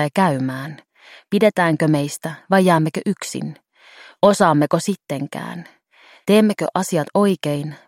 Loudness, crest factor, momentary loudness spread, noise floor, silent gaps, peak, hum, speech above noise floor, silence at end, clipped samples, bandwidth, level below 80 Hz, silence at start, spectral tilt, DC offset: -18 LUFS; 18 dB; 14 LU; -51 dBFS; none; -2 dBFS; none; 33 dB; 0.1 s; under 0.1%; 16.5 kHz; -64 dBFS; 0 s; -6 dB/octave; under 0.1%